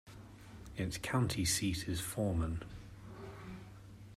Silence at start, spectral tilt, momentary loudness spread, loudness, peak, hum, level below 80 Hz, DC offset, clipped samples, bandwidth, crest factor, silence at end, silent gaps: 0.05 s; -4.5 dB/octave; 21 LU; -36 LUFS; -22 dBFS; none; -54 dBFS; under 0.1%; under 0.1%; 16 kHz; 18 dB; 0 s; none